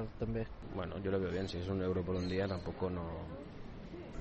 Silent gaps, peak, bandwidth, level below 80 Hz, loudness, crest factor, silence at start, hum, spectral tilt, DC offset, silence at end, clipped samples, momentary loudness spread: none; -24 dBFS; 8.4 kHz; -52 dBFS; -39 LUFS; 16 dB; 0 s; none; -7.5 dB/octave; under 0.1%; 0 s; under 0.1%; 13 LU